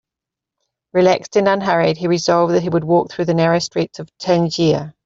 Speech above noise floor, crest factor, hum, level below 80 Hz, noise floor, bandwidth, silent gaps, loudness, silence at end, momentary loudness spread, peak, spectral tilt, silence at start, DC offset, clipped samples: 69 dB; 16 dB; none; -56 dBFS; -85 dBFS; 7.8 kHz; none; -17 LUFS; 0.15 s; 7 LU; -2 dBFS; -6 dB/octave; 0.95 s; under 0.1%; under 0.1%